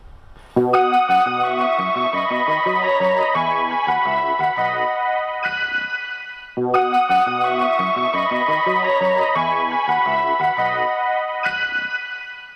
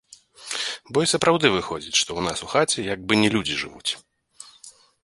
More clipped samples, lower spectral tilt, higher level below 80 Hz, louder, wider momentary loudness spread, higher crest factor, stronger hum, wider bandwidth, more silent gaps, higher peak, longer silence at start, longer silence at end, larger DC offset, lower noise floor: neither; first, -5.5 dB/octave vs -3 dB/octave; about the same, -54 dBFS vs -54 dBFS; first, -19 LUFS vs -22 LUFS; second, 6 LU vs 12 LU; second, 16 dB vs 22 dB; neither; second, 9.8 kHz vs 11.5 kHz; neither; about the same, -4 dBFS vs -2 dBFS; second, 0.05 s vs 0.4 s; second, 0 s vs 0.35 s; neither; second, -41 dBFS vs -50 dBFS